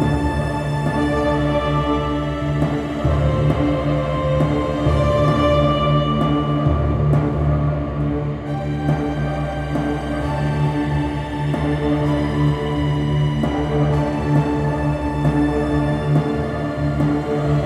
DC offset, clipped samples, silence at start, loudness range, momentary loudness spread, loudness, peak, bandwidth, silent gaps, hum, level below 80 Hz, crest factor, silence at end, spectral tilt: under 0.1%; under 0.1%; 0 s; 4 LU; 5 LU; -19 LUFS; -4 dBFS; 10 kHz; none; none; -28 dBFS; 14 dB; 0 s; -8 dB/octave